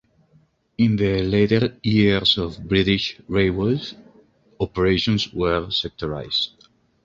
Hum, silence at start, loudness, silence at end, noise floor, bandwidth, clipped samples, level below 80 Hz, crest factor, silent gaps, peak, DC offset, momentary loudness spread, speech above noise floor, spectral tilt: none; 0.8 s; -21 LUFS; 0.55 s; -59 dBFS; 7.6 kHz; under 0.1%; -42 dBFS; 18 dB; none; -4 dBFS; under 0.1%; 10 LU; 39 dB; -6.5 dB/octave